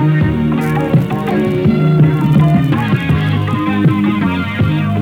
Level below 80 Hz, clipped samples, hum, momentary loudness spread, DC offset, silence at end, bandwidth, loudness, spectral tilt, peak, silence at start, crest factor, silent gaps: -34 dBFS; under 0.1%; none; 5 LU; under 0.1%; 0 s; 5.2 kHz; -13 LUFS; -8.5 dB/octave; -2 dBFS; 0 s; 12 dB; none